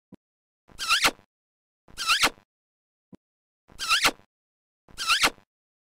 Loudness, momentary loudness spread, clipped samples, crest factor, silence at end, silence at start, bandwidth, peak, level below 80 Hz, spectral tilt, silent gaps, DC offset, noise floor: -23 LUFS; 11 LU; under 0.1%; 24 dB; 0.65 s; 0.1 s; 16 kHz; -6 dBFS; -56 dBFS; 0.5 dB/octave; 0.17-0.68 s, 1.26-1.88 s, 2.45-3.68 s, 4.26-4.88 s; under 0.1%; under -90 dBFS